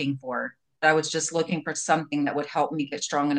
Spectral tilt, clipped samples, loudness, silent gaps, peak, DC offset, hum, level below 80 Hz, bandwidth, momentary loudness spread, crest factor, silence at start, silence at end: -4 dB/octave; under 0.1%; -26 LUFS; none; -6 dBFS; under 0.1%; none; -76 dBFS; 10 kHz; 8 LU; 20 dB; 0 s; 0 s